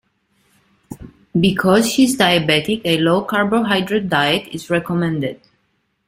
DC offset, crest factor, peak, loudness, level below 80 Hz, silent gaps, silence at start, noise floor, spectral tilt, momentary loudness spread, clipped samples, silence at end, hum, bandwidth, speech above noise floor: under 0.1%; 18 dB; 0 dBFS; -17 LUFS; -50 dBFS; none; 0.9 s; -66 dBFS; -4.5 dB/octave; 10 LU; under 0.1%; 0.7 s; none; 16 kHz; 50 dB